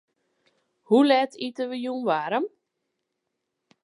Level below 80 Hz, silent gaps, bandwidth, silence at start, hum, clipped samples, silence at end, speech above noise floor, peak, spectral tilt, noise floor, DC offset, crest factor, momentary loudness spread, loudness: -84 dBFS; none; 11 kHz; 0.9 s; none; under 0.1%; 1.35 s; 58 dB; -8 dBFS; -5.5 dB/octave; -81 dBFS; under 0.1%; 20 dB; 12 LU; -24 LUFS